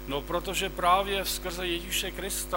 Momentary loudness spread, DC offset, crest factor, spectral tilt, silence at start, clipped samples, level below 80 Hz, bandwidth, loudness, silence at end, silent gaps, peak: 7 LU; under 0.1%; 18 dB; -2.5 dB/octave; 0 s; under 0.1%; -42 dBFS; 16.5 kHz; -28 LUFS; 0 s; none; -12 dBFS